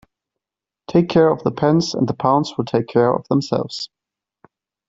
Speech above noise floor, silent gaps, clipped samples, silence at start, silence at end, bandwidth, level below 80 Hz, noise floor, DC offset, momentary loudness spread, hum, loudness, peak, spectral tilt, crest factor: 70 dB; none; under 0.1%; 0.9 s; 1.05 s; 7.8 kHz; -54 dBFS; -87 dBFS; under 0.1%; 7 LU; none; -18 LUFS; -2 dBFS; -6.5 dB/octave; 16 dB